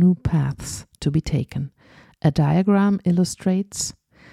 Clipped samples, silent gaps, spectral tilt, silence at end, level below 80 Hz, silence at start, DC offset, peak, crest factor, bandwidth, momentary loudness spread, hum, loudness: under 0.1%; none; -6.5 dB/octave; 0.4 s; -42 dBFS; 0 s; under 0.1%; -6 dBFS; 16 dB; 14 kHz; 12 LU; none; -22 LUFS